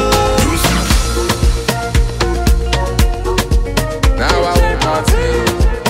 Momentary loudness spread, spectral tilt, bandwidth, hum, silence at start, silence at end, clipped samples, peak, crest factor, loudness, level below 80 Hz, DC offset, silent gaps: 3 LU; -4.5 dB/octave; 16.5 kHz; none; 0 s; 0 s; under 0.1%; 0 dBFS; 12 dB; -14 LUFS; -16 dBFS; under 0.1%; none